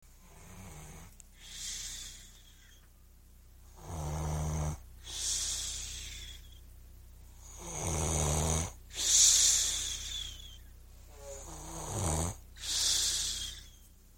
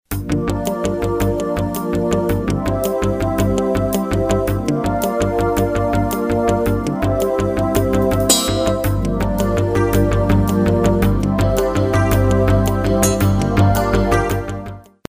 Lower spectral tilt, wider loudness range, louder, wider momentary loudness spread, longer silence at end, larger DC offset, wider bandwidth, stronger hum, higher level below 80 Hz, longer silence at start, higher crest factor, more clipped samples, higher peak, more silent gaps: second, -1.5 dB/octave vs -6 dB/octave; first, 17 LU vs 3 LU; second, -30 LUFS vs -17 LUFS; first, 25 LU vs 5 LU; about the same, 0.3 s vs 0.3 s; neither; about the same, 16.5 kHz vs 16 kHz; neither; second, -46 dBFS vs -26 dBFS; about the same, 0.2 s vs 0.1 s; first, 24 dB vs 16 dB; neither; second, -12 dBFS vs 0 dBFS; neither